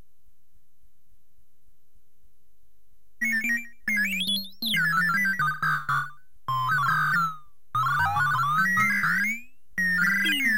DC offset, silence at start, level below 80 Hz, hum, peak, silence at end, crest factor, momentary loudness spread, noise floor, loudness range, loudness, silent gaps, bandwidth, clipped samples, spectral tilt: 1%; 3.2 s; -60 dBFS; none; -12 dBFS; 0 s; 14 dB; 8 LU; -69 dBFS; 7 LU; -24 LUFS; none; 16 kHz; under 0.1%; -2.5 dB/octave